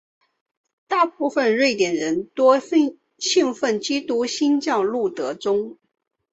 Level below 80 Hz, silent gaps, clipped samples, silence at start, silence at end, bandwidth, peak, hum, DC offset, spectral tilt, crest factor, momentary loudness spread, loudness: -68 dBFS; none; under 0.1%; 0.9 s; 0.6 s; 8.2 kHz; -4 dBFS; none; under 0.1%; -3 dB/octave; 18 dB; 7 LU; -21 LUFS